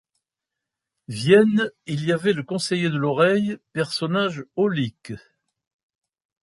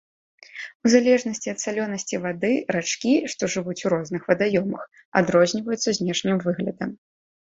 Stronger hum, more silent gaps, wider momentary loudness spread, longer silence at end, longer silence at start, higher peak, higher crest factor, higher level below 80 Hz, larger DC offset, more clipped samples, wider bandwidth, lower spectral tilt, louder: neither; second, none vs 0.75-0.80 s, 5.05-5.12 s; about the same, 13 LU vs 11 LU; first, 1.25 s vs 0.6 s; first, 1.1 s vs 0.55 s; about the same, -4 dBFS vs -4 dBFS; about the same, 20 dB vs 20 dB; about the same, -64 dBFS vs -62 dBFS; neither; neither; first, 11.5 kHz vs 8 kHz; first, -6 dB/octave vs -4.5 dB/octave; about the same, -22 LUFS vs -23 LUFS